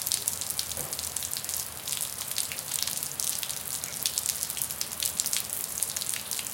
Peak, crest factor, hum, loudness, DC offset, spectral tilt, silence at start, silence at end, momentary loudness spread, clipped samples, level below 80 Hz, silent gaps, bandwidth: -2 dBFS; 30 dB; none; -29 LUFS; under 0.1%; 0.5 dB/octave; 0 s; 0 s; 4 LU; under 0.1%; -62 dBFS; none; 17 kHz